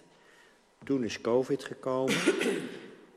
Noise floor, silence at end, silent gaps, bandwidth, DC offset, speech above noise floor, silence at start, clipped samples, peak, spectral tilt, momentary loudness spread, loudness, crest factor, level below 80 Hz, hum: -61 dBFS; 0.2 s; none; 13.5 kHz; under 0.1%; 31 dB; 0.8 s; under 0.1%; -12 dBFS; -4.5 dB/octave; 14 LU; -30 LUFS; 20 dB; -72 dBFS; none